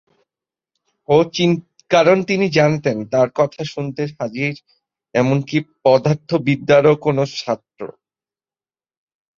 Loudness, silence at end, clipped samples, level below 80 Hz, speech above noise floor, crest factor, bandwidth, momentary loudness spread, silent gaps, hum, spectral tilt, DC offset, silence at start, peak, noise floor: -17 LUFS; 1.5 s; under 0.1%; -58 dBFS; over 73 dB; 18 dB; 7.4 kHz; 12 LU; none; none; -6.5 dB/octave; under 0.1%; 1.1 s; -2 dBFS; under -90 dBFS